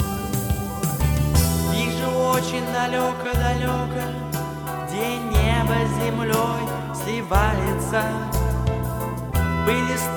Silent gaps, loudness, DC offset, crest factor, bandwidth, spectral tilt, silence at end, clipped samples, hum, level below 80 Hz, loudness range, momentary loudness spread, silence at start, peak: none; -23 LUFS; under 0.1%; 18 dB; 19.5 kHz; -5.5 dB/octave; 0 s; under 0.1%; none; -30 dBFS; 2 LU; 7 LU; 0 s; -4 dBFS